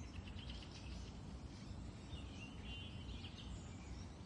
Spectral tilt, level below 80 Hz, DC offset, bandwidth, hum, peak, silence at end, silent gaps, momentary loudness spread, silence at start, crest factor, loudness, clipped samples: -5 dB/octave; -56 dBFS; under 0.1%; 11 kHz; none; -38 dBFS; 0 s; none; 3 LU; 0 s; 12 dB; -52 LUFS; under 0.1%